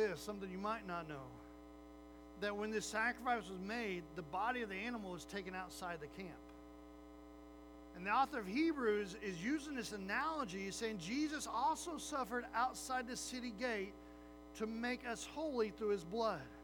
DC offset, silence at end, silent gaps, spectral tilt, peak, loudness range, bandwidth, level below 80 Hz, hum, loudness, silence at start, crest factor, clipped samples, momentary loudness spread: under 0.1%; 0 s; none; -4 dB/octave; -24 dBFS; 5 LU; over 20 kHz; -64 dBFS; 60 Hz at -65 dBFS; -42 LUFS; 0 s; 18 dB; under 0.1%; 19 LU